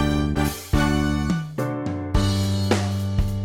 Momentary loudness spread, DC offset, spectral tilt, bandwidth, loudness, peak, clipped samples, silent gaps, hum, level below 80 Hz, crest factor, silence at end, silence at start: 5 LU; under 0.1%; -6 dB/octave; 17.5 kHz; -23 LUFS; -4 dBFS; under 0.1%; none; none; -30 dBFS; 18 dB; 0 s; 0 s